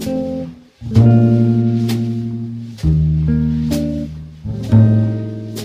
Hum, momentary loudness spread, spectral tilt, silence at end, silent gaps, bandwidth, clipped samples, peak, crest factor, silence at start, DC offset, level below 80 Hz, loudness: none; 16 LU; -8.5 dB/octave; 0 s; none; 15 kHz; under 0.1%; 0 dBFS; 14 dB; 0 s; under 0.1%; -30 dBFS; -16 LUFS